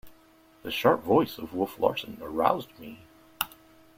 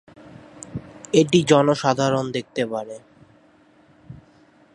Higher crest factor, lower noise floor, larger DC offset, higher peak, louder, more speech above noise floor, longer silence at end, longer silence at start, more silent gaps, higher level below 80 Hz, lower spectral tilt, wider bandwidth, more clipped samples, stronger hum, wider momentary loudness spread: about the same, 24 dB vs 22 dB; about the same, -58 dBFS vs -55 dBFS; neither; second, -6 dBFS vs -2 dBFS; second, -28 LUFS vs -20 LUFS; second, 31 dB vs 35 dB; about the same, 0.5 s vs 0.6 s; second, 0.05 s vs 0.55 s; neither; about the same, -62 dBFS vs -58 dBFS; about the same, -5 dB/octave vs -5.5 dB/octave; first, 16.5 kHz vs 11.5 kHz; neither; neither; about the same, 19 LU vs 21 LU